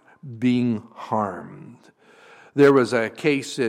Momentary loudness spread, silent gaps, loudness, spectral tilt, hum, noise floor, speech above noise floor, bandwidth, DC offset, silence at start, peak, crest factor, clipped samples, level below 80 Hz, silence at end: 18 LU; none; -21 LUFS; -6 dB/octave; none; -50 dBFS; 29 dB; 12.5 kHz; under 0.1%; 0.25 s; -6 dBFS; 18 dB; under 0.1%; -68 dBFS; 0 s